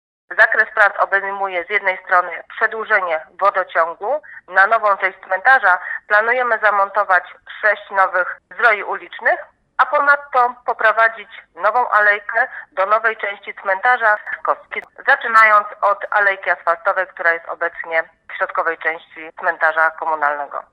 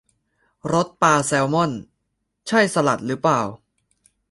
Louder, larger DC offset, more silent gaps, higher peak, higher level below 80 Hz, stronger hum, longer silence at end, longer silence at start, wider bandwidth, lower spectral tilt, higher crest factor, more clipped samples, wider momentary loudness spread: first, -16 LUFS vs -20 LUFS; neither; neither; about the same, 0 dBFS vs -2 dBFS; second, -70 dBFS vs -58 dBFS; neither; second, 0.1 s vs 0.75 s; second, 0.3 s vs 0.65 s; about the same, 11 kHz vs 11.5 kHz; second, -3 dB/octave vs -4.5 dB/octave; about the same, 18 dB vs 20 dB; neither; second, 10 LU vs 14 LU